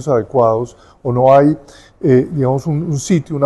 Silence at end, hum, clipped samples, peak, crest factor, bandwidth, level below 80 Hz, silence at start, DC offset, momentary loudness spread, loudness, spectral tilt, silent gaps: 0 s; none; under 0.1%; 0 dBFS; 14 dB; 12 kHz; -46 dBFS; 0 s; under 0.1%; 11 LU; -14 LUFS; -7.5 dB/octave; none